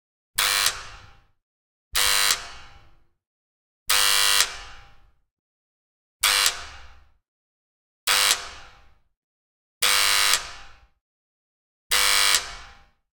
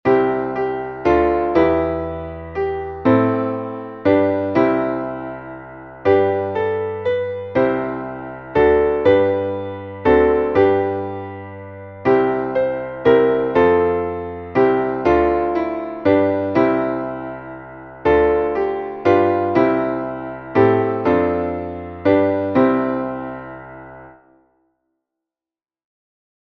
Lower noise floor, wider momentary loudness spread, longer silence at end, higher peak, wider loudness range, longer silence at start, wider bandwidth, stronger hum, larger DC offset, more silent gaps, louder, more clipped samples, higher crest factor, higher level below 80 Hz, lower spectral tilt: second, -53 dBFS vs under -90 dBFS; first, 20 LU vs 14 LU; second, 0.5 s vs 2.35 s; about the same, -2 dBFS vs -2 dBFS; about the same, 5 LU vs 4 LU; first, 0.35 s vs 0.05 s; first, 19 kHz vs 6.2 kHz; neither; neither; first, 1.43-1.91 s, 3.27-3.86 s, 5.31-6.20 s, 7.28-8.07 s, 9.17-9.81 s, 11.01-11.90 s vs none; about the same, -20 LUFS vs -18 LUFS; neither; first, 26 dB vs 16 dB; second, -52 dBFS vs -42 dBFS; second, 2.5 dB/octave vs -9 dB/octave